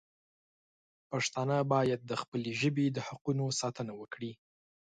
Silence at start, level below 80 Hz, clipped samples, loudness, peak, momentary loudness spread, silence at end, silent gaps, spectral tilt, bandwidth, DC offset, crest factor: 1.1 s; -72 dBFS; under 0.1%; -34 LUFS; -14 dBFS; 12 LU; 0.55 s; 2.28-2.32 s, 3.21-3.25 s; -5 dB/octave; 9.4 kHz; under 0.1%; 20 dB